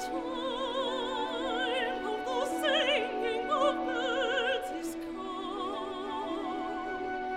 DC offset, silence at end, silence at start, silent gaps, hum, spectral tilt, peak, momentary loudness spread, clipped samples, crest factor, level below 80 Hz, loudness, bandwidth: under 0.1%; 0 s; 0 s; none; none; -2.5 dB/octave; -16 dBFS; 8 LU; under 0.1%; 16 dB; -60 dBFS; -32 LUFS; 16 kHz